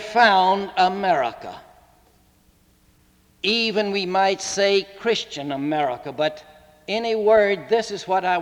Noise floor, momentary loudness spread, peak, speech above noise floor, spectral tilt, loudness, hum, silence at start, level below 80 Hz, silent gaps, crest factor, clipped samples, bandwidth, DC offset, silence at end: -58 dBFS; 10 LU; -4 dBFS; 37 dB; -3.5 dB/octave; -21 LUFS; none; 0 s; -60 dBFS; none; 18 dB; under 0.1%; 14.5 kHz; under 0.1%; 0 s